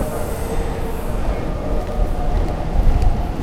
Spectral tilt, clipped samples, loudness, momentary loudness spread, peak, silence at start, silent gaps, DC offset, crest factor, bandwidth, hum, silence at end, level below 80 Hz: -7 dB/octave; under 0.1%; -23 LUFS; 5 LU; -2 dBFS; 0 s; none; under 0.1%; 16 dB; 15 kHz; none; 0 s; -20 dBFS